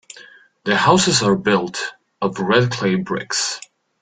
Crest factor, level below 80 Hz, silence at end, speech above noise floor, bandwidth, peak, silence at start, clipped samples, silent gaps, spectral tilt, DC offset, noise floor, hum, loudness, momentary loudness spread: 18 dB; -56 dBFS; 0.4 s; 28 dB; 9.6 kHz; -2 dBFS; 0.15 s; under 0.1%; none; -4 dB/octave; under 0.1%; -45 dBFS; none; -18 LUFS; 13 LU